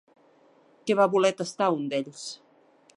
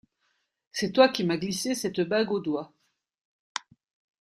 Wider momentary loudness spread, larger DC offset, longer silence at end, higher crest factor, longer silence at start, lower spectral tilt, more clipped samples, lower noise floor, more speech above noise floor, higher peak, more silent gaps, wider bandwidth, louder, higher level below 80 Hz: about the same, 17 LU vs 16 LU; neither; second, 0.6 s vs 1.55 s; about the same, 20 dB vs 24 dB; about the same, 0.85 s vs 0.75 s; about the same, -4.5 dB/octave vs -4.5 dB/octave; neither; second, -60 dBFS vs -75 dBFS; second, 35 dB vs 49 dB; about the same, -8 dBFS vs -6 dBFS; neither; second, 11.5 kHz vs 15.5 kHz; about the same, -26 LUFS vs -26 LUFS; second, -84 dBFS vs -68 dBFS